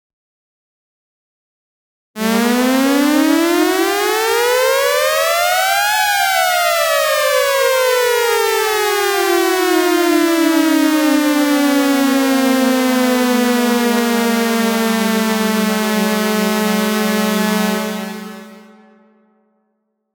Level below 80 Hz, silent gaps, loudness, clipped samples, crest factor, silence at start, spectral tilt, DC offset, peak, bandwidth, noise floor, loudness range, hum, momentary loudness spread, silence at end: -60 dBFS; none; -14 LUFS; under 0.1%; 14 dB; 2.15 s; -3.5 dB/octave; under 0.1%; -2 dBFS; over 20 kHz; -69 dBFS; 4 LU; none; 3 LU; 1.55 s